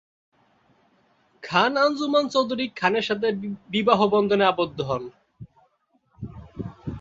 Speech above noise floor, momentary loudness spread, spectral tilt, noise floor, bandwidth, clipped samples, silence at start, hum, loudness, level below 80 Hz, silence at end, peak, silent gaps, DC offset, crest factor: 45 dB; 20 LU; -5.5 dB/octave; -67 dBFS; 7.8 kHz; under 0.1%; 1.45 s; none; -22 LUFS; -54 dBFS; 0 s; -4 dBFS; none; under 0.1%; 22 dB